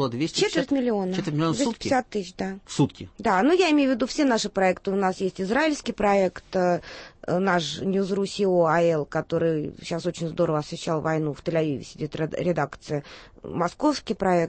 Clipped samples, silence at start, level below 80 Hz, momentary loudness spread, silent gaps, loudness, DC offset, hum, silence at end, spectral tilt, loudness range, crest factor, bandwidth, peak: under 0.1%; 0 s; -54 dBFS; 10 LU; none; -25 LUFS; under 0.1%; none; 0 s; -5.5 dB/octave; 4 LU; 16 dB; 8.8 kHz; -8 dBFS